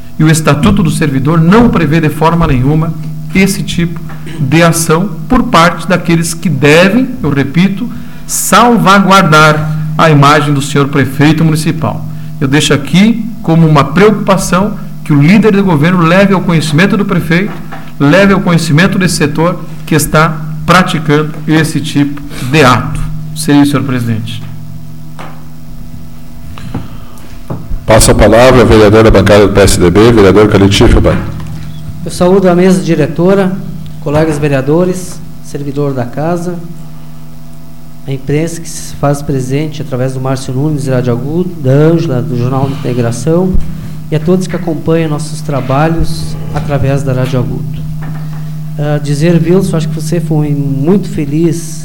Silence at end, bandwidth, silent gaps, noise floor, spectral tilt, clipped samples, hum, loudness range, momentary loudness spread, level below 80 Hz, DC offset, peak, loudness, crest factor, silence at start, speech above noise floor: 0 s; 17.5 kHz; none; -31 dBFS; -6 dB/octave; 0.4%; none; 9 LU; 16 LU; -24 dBFS; 8%; 0 dBFS; -9 LUFS; 10 dB; 0 s; 23 dB